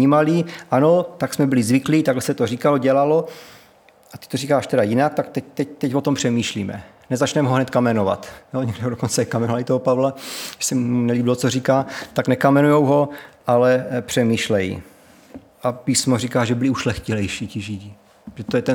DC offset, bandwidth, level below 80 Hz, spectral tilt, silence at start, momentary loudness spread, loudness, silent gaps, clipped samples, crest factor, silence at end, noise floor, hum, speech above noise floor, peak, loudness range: under 0.1%; over 20 kHz; -56 dBFS; -5.5 dB/octave; 0 s; 12 LU; -20 LUFS; none; under 0.1%; 18 dB; 0 s; -51 dBFS; none; 32 dB; -2 dBFS; 4 LU